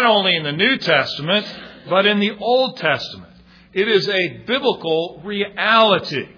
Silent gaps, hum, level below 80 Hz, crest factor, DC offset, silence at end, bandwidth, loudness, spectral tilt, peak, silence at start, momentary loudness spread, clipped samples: none; none; -60 dBFS; 18 dB; under 0.1%; 0.1 s; 5.4 kHz; -17 LUFS; -5.5 dB/octave; 0 dBFS; 0 s; 10 LU; under 0.1%